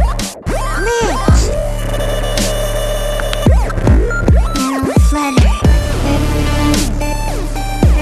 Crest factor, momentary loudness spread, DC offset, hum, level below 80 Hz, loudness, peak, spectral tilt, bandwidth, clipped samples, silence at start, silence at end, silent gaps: 12 dB; 7 LU; under 0.1%; none; -16 dBFS; -15 LUFS; 0 dBFS; -5.5 dB/octave; 13 kHz; under 0.1%; 0 s; 0 s; none